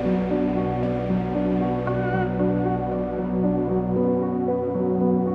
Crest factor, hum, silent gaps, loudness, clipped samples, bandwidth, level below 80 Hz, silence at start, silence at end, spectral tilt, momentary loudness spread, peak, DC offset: 12 dB; none; none; -23 LUFS; under 0.1%; 4.8 kHz; -42 dBFS; 0 s; 0 s; -10.5 dB/octave; 2 LU; -10 dBFS; under 0.1%